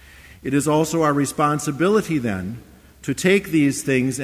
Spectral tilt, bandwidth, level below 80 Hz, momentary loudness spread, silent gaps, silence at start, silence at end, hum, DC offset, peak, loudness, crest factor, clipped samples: -5.5 dB/octave; 16 kHz; -50 dBFS; 12 LU; none; 0.2 s; 0 s; none; under 0.1%; -6 dBFS; -20 LUFS; 14 dB; under 0.1%